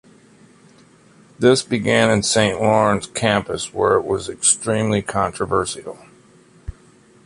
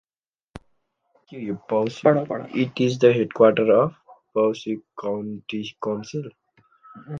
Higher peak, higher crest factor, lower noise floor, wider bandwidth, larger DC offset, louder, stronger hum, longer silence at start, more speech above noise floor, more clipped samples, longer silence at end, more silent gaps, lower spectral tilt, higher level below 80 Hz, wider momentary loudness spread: about the same, -2 dBFS vs -4 dBFS; about the same, 18 dB vs 20 dB; second, -50 dBFS vs under -90 dBFS; first, 11.5 kHz vs 7.6 kHz; neither; first, -18 LUFS vs -22 LUFS; neither; first, 1.4 s vs 0.55 s; second, 32 dB vs over 68 dB; neither; first, 0.55 s vs 0 s; neither; second, -4 dB/octave vs -7 dB/octave; first, -46 dBFS vs -64 dBFS; about the same, 15 LU vs 15 LU